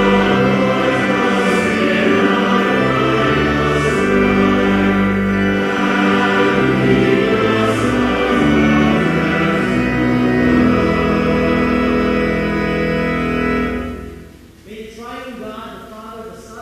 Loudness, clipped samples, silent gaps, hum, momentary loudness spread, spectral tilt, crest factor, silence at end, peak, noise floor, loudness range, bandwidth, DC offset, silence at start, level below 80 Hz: -15 LUFS; under 0.1%; none; none; 16 LU; -6.5 dB/octave; 14 dB; 0 s; 0 dBFS; -39 dBFS; 6 LU; 14 kHz; under 0.1%; 0 s; -34 dBFS